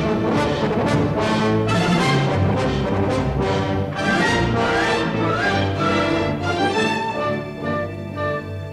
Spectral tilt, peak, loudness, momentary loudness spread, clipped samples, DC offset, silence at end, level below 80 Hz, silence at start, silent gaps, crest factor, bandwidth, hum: -6 dB/octave; -6 dBFS; -20 LUFS; 7 LU; under 0.1%; under 0.1%; 0 s; -38 dBFS; 0 s; none; 14 dB; 12.5 kHz; none